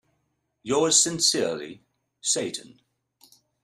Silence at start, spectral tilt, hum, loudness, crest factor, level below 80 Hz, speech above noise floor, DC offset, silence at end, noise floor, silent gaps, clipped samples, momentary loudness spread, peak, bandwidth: 0.65 s; -1.5 dB/octave; none; -22 LUFS; 22 dB; -68 dBFS; 50 dB; under 0.1%; 1 s; -75 dBFS; none; under 0.1%; 19 LU; -6 dBFS; 15.5 kHz